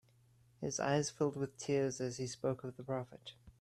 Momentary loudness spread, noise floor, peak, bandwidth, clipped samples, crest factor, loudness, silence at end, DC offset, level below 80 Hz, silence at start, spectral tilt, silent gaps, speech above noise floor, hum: 11 LU; -68 dBFS; -20 dBFS; 13 kHz; under 0.1%; 18 dB; -38 LUFS; 0.1 s; under 0.1%; -72 dBFS; 0.6 s; -5 dB/octave; none; 30 dB; none